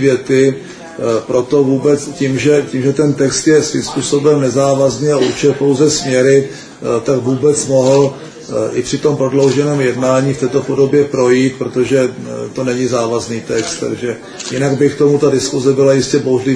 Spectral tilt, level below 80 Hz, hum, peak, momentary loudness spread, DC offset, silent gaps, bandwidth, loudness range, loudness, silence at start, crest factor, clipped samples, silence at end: -5.5 dB/octave; -48 dBFS; none; 0 dBFS; 8 LU; under 0.1%; none; 10.5 kHz; 3 LU; -13 LUFS; 0 s; 12 dB; under 0.1%; 0 s